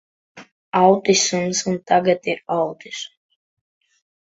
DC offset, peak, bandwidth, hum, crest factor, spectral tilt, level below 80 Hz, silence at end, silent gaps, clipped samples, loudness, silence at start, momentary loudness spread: under 0.1%; -2 dBFS; 8 kHz; none; 20 dB; -3.5 dB/octave; -64 dBFS; 1.15 s; 0.52-0.72 s; under 0.1%; -19 LUFS; 0.35 s; 16 LU